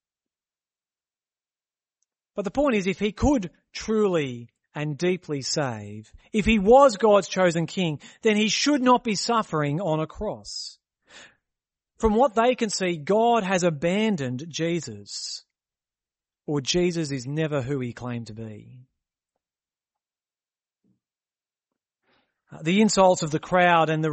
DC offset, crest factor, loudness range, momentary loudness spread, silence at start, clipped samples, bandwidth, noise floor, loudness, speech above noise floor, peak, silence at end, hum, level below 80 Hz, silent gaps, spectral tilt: under 0.1%; 20 dB; 9 LU; 15 LU; 2.35 s; under 0.1%; 8.8 kHz; under -90 dBFS; -23 LUFS; over 67 dB; -4 dBFS; 0 s; none; -48 dBFS; none; -5 dB/octave